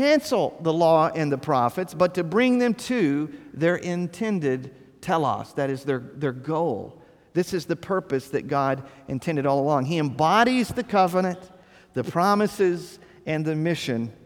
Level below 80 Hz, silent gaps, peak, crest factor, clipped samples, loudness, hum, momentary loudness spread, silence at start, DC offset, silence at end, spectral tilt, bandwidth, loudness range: -60 dBFS; none; -6 dBFS; 18 dB; under 0.1%; -24 LUFS; none; 11 LU; 0 s; under 0.1%; 0.15 s; -6 dB/octave; 18.5 kHz; 5 LU